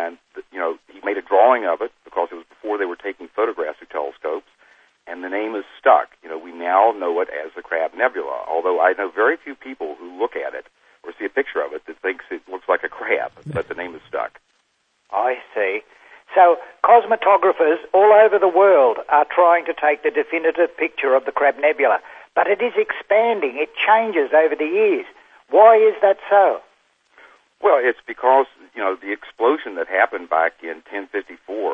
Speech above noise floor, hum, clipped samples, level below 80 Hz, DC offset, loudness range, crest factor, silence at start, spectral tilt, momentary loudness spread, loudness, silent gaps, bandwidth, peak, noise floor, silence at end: 48 dB; none; under 0.1%; -66 dBFS; under 0.1%; 11 LU; 18 dB; 0 s; -6.5 dB/octave; 15 LU; -18 LUFS; none; 5 kHz; 0 dBFS; -66 dBFS; 0 s